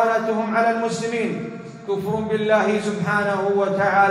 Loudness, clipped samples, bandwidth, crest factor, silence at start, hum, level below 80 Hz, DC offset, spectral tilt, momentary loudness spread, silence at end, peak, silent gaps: -21 LUFS; under 0.1%; 14.5 kHz; 16 dB; 0 s; none; -60 dBFS; under 0.1%; -5.5 dB/octave; 8 LU; 0 s; -6 dBFS; none